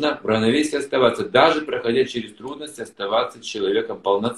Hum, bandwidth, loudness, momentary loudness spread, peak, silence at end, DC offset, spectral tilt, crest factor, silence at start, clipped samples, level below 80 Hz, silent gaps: none; 12.5 kHz; -20 LUFS; 16 LU; 0 dBFS; 0 s; under 0.1%; -4.5 dB/octave; 20 dB; 0 s; under 0.1%; -58 dBFS; none